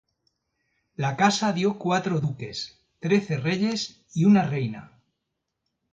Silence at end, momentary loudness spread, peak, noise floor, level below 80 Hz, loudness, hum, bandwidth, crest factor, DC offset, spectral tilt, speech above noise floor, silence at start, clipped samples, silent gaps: 1.1 s; 14 LU; -6 dBFS; -81 dBFS; -64 dBFS; -25 LUFS; none; 7.8 kHz; 20 dB; under 0.1%; -5.5 dB/octave; 57 dB; 1 s; under 0.1%; none